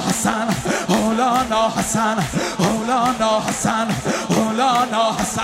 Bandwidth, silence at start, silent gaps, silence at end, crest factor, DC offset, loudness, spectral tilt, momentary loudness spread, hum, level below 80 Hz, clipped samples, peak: 16 kHz; 0 s; none; 0 s; 16 dB; under 0.1%; -19 LUFS; -4 dB/octave; 4 LU; none; -44 dBFS; under 0.1%; -2 dBFS